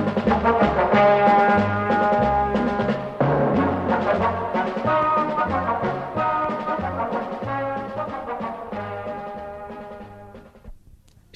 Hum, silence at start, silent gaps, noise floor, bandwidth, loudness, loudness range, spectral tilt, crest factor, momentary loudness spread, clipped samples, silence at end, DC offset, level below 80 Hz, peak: none; 0 s; none; -51 dBFS; 8.4 kHz; -21 LUFS; 12 LU; -8 dB/octave; 16 dB; 15 LU; under 0.1%; 0.6 s; under 0.1%; -44 dBFS; -6 dBFS